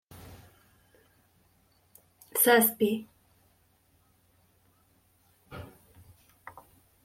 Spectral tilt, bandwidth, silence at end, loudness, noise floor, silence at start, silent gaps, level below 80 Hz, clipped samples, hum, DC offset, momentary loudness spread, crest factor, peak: -3 dB/octave; 16.5 kHz; 1.4 s; -25 LUFS; -67 dBFS; 0.3 s; none; -68 dBFS; under 0.1%; none; under 0.1%; 30 LU; 24 dB; -10 dBFS